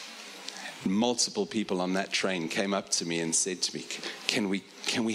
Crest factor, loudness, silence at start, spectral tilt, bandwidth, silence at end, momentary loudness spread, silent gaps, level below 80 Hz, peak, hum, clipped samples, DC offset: 26 dB; -29 LUFS; 0 s; -2.5 dB/octave; 15.5 kHz; 0 s; 10 LU; none; -72 dBFS; -4 dBFS; none; under 0.1%; under 0.1%